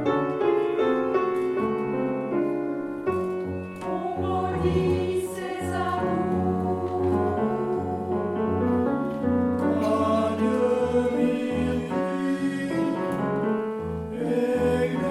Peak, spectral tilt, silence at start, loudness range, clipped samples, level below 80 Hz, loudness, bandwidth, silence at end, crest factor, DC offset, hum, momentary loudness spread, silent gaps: -10 dBFS; -7.5 dB/octave; 0 s; 3 LU; under 0.1%; -50 dBFS; -26 LUFS; 13.5 kHz; 0 s; 14 dB; under 0.1%; none; 6 LU; none